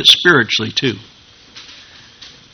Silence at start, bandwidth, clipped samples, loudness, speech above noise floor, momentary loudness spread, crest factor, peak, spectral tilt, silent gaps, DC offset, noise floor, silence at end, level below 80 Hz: 0 s; over 20 kHz; 0.3%; -12 LUFS; 28 dB; 27 LU; 16 dB; 0 dBFS; -3 dB/octave; none; under 0.1%; -41 dBFS; 0.25 s; -54 dBFS